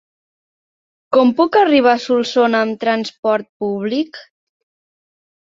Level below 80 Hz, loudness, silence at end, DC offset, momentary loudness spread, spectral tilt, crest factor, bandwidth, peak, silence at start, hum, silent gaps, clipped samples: -64 dBFS; -16 LUFS; 1.35 s; under 0.1%; 10 LU; -5 dB/octave; 16 dB; 7.6 kHz; -2 dBFS; 1.1 s; none; 3.18-3.23 s, 3.49-3.60 s; under 0.1%